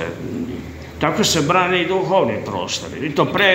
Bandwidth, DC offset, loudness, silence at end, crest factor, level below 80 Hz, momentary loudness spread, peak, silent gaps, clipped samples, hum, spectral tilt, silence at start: 16 kHz; under 0.1%; -19 LUFS; 0 s; 18 dB; -46 dBFS; 12 LU; 0 dBFS; none; under 0.1%; none; -4 dB/octave; 0 s